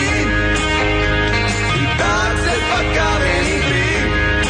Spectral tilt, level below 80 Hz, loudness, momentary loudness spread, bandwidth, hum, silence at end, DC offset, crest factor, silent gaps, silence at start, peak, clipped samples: -4.5 dB/octave; -24 dBFS; -16 LUFS; 1 LU; 10 kHz; none; 0 s; under 0.1%; 12 dB; none; 0 s; -4 dBFS; under 0.1%